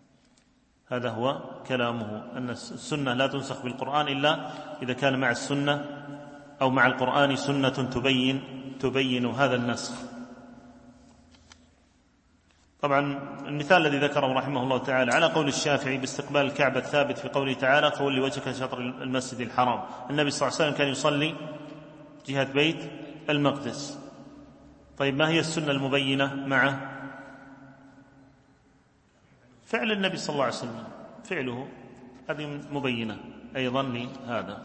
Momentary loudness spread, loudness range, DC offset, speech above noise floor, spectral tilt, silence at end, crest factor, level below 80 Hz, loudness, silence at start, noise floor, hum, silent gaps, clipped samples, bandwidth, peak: 17 LU; 8 LU; under 0.1%; 37 dB; -4.5 dB/octave; 0 s; 22 dB; -64 dBFS; -27 LUFS; 0.9 s; -64 dBFS; none; none; under 0.1%; 8.8 kHz; -6 dBFS